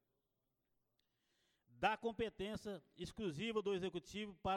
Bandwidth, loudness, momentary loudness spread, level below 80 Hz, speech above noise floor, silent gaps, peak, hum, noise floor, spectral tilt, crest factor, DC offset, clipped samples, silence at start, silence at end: 13.5 kHz; -44 LUFS; 10 LU; -68 dBFS; 45 dB; none; -24 dBFS; none; -88 dBFS; -5 dB/octave; 22 dB; under 0.1%; under 0.1%; 1.75 s; 0 s